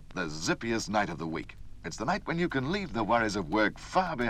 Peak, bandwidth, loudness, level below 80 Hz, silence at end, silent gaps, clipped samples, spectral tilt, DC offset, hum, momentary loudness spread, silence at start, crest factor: -14 dBFS; 14 kHz; -31 LUFS; -48 dBFS; 0 s; none; under 0.1%; -5 dB/octave; under 0.1%; none; 10 LU; 0 s; 18 dB